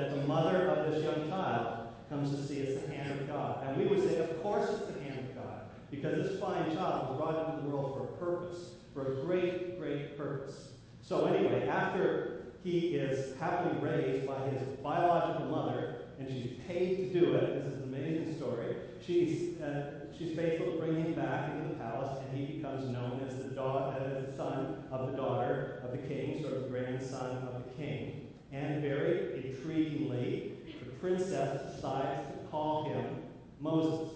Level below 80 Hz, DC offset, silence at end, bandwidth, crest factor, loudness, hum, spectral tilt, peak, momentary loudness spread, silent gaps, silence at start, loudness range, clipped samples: -64 dBFS; under 0.1%; 0 s; 8 kHz; 18 dB; -35 LUFS; none; -7.5 dB/octave; -16 dBFS; 11 LU; none; 0 s; 4 LU; under 0.1%